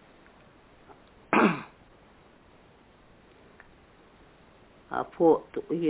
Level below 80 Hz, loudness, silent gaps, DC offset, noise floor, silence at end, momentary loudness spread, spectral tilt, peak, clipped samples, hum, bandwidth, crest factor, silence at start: -64 dBFS; -26 LUFS; none; under 0.1%; -57 dBFS; 0 s; 13 LU; -5.5 dB/octave; -8 dBFS; under 0.1%; none; 4 kHz; 22 dB; 1.3 s